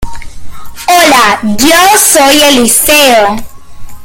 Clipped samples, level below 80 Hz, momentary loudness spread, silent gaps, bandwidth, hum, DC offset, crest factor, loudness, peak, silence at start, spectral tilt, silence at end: 2%; -30 dBFS; 10 LU; none; over 20 kHz; none; under 0.1%; 6 dB; -4 LUFS; 0 dBFS; 0 s; -1.5 dB/octave; 0 s